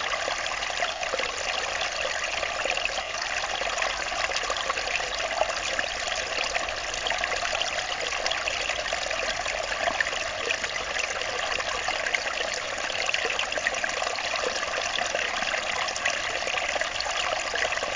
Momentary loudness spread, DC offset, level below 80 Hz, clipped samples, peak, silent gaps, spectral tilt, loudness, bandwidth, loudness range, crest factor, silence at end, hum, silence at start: 2 LU; under 0.1%; -50 dBFS; under 0.1%; -8 dBFS; none; 0 dB/octave; -27 LUFS; 7.8 kHz; 1 LU; 20 dB; 0 s; none; 0 s